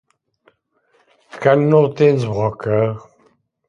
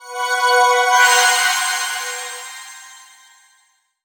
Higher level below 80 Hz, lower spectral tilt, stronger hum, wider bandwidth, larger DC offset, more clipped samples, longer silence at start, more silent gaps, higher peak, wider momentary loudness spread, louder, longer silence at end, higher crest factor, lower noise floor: first, -54 dBFS vs -78 dBFS; first, -8.5 dB/octave vs 4.5 dB/octave; neither; second, 7.4 kHz vs over 20 kHz; neither; neither; first, 1.35 s vs 0 s; neither; about the same, 0 dBFS vs -2 dBFS; second, 8 LU vs 20 LU; about the same, -16 LUFS vs -15 LUFS; second, 0.7 s vs 1.1 s; about the same, 18 dB vs 18 dB; about the same, -62 dBFS vs -60 dBFS